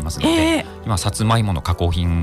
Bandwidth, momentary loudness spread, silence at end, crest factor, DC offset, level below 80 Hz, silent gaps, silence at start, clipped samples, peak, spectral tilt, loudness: 14.5 kHz; 5 LU; 0 s; 12 dB; under 0.1%; -30 dBFS; none; 0 s; under 0.1%; -6 dBFS; -5.5 dB/octave; -19 LUFS